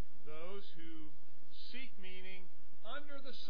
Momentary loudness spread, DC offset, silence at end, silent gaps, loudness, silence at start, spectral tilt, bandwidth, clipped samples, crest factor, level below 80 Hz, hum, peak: 11 LU; 4%; 0 s; none; -53 LUFS; 0 s; -6.5 dB/octave; 5.4 kHz; under 0.1%; 18 dB; -68 dBFS; none; -26 dBFS